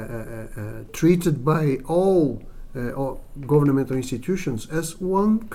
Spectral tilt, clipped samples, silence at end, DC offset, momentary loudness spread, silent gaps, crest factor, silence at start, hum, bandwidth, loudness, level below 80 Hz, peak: -7.5 dB/octave; under 0.1%; 0 s; under 0.1%; 15 LU; none; 16 dB; 0 s; none; 16 kHz; -22 LUFS; -40 dBFS; -6 dBFS